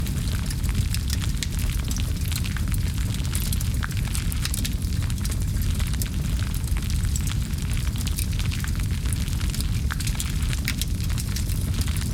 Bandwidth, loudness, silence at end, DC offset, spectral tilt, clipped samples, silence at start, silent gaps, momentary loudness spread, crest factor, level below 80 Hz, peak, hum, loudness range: 18.5 kHz; -26 LUFS; 0 s; under 0.1%; -4.5 dB/octave; under 0.1%; 0 s; none; 1 LU; 20 dB; -28 dBFS; -4 dBFS; none; 0 LU